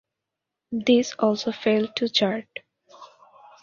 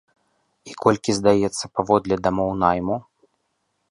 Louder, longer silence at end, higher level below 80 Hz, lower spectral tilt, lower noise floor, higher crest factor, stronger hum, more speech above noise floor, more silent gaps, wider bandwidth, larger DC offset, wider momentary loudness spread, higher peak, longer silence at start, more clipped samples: about the same, -23 LUFS vs -21 LUFS; second, 0.55 s vs 0.9 s; second, -68 dBFS vs -50 dBFS; about the same, -4.5 dB/octave vs -5.5 dB/octave; first, -85 dBFS vs -72 dBFS; about the same, 20 dB vs 20 dB; neither; first, 62 dB vs 52 dB; neither; second, 7.2 kHz vs 11.5 kHz; neither; first, 13 LU vs 8 LU; second, -6 dBFS vs -2 dBFS; about the same, 0.7 s vs 0.65 s; neither